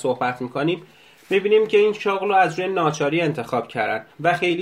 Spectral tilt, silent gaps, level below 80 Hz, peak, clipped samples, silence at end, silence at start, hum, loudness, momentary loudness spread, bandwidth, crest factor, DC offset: -5.5 dB/octave; none; -66 dBFS; -4 dBFS; under 0.1%; 0 s; 0 s; none; -21 LUFS; 7 LU; 12.5 kHz; 16 dB; under 0.1%